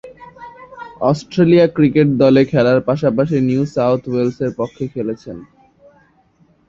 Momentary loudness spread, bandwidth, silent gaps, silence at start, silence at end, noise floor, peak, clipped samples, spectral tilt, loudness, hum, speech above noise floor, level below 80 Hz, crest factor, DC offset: 22 LU; 7.6 kHz; none; 0.05 s; 1.25 s; -54 dBFS; -2 dBFS; under 0.1%; -8 dB/octave; -15 LUFS; none; 40 dB; -50 dBFS; 14 dB; under 0.1%